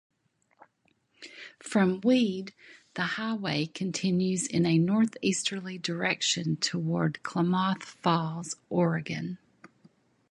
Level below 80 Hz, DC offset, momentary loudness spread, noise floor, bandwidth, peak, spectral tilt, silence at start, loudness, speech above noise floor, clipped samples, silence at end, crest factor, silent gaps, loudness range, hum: -70 dBFS; under 0.1%; 14 LU; -71 dBFS; 11.5 kHz; -10 dBFS; -5 dB/octave; 1.2 s; -28 LUFS; 43 dB; under 0.1%; 0.95 s; 20 dB; none; 3 LU; none